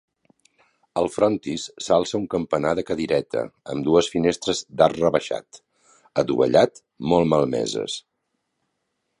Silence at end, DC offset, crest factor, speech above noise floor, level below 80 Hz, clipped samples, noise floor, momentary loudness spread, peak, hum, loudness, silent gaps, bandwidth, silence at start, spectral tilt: 1.2 s; under 0.1%; 20 dB; 54 dB; -54 dBFS; under 0.1%; -76 dBFS; 12 LU; -2 dBFS; none; -22 LUFS; none; 11 kHz; 0.95 s; -5 dB/octave